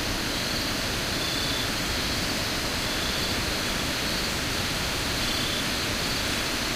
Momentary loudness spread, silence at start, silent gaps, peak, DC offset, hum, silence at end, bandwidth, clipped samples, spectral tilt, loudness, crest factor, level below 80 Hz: 1 LU; 0 s; none; -16 dBFS; under 0.1%; none; 0 s; 16 kHz; under 0.1%; -2.5 dB/octave; -26 LUFS; 12 dB; -40 dBFS